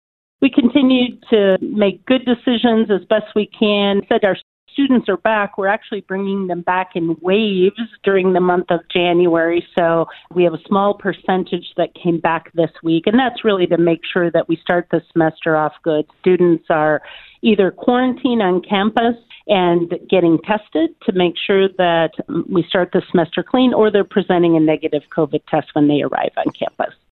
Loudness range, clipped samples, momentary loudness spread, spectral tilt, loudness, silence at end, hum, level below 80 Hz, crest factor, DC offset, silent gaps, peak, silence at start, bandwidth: 2 LU; under 0.1%; 6 LU; -9.5 dB/octave; -16 LUFS; 0.2 s; none; -56 dBFS; 16 dB; under 0.1%; 4.43-4.67 s; 0 dBFS; 0.4 s; 4.3 kHz